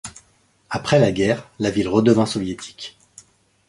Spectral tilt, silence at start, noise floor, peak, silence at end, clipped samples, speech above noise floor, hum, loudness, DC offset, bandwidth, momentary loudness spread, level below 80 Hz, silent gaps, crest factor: -6 dB/octave; 0.05 s; -59 dBFS; -2 dBFS; 0.8 s; under 0.1%; 40 dB; none; -19 LUFS; under 0.1%; 11.5 kHz; 19 LU; -50 dBFS; none; 20 dB